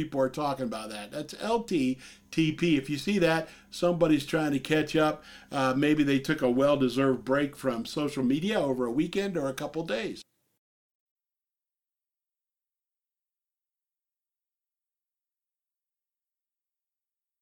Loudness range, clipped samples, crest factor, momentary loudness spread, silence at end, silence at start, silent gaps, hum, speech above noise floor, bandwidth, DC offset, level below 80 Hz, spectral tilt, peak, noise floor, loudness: 9 LU; under 0.1%; 20 dB; 10 LU; 7.2 s; 0 s; none; none; over 62 dB; 17 kHz; under 0.1%; -60 dBFS; -6 dB/octave; -10 dBFS; under -90 dBFS; -28 LUFS